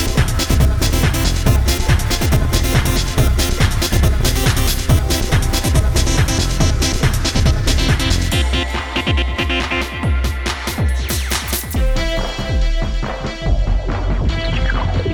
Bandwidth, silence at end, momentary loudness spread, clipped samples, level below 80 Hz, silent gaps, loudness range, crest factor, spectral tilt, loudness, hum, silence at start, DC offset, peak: over 20 kHz; 0 s; 5 LU; under 0.1%; -18 dBFS; none; 4 LU; 14 dB; -4.5 dB/octave; -17 LUFS; none; 0 s; under 0.1%; -2 dBFS